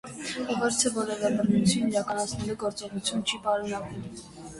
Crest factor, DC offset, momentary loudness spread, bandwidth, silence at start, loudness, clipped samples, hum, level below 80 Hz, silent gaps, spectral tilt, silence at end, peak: 18 dB; under 0.1%; 11 LU; 11.5 kHz; 0.05 s; -28 LUFS; under 0.1%; none; -56 dBFS; none; -4 dB/octave; 0 s; -10 dBFS